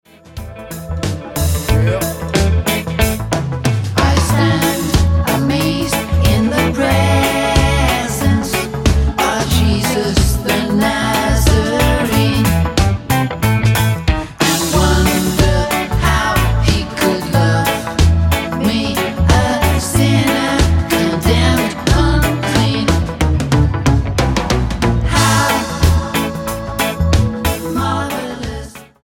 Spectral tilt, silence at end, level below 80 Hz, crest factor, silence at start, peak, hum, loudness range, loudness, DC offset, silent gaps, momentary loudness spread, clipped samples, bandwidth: -5 dB/octave; 0.2 s; -22 dBFS; 14 dB; 0.3 s; 0 dBFS; none; 2 LU; -15 LUFS; under 0.1%; none; 6 LU; under 0.1%; 17 kHz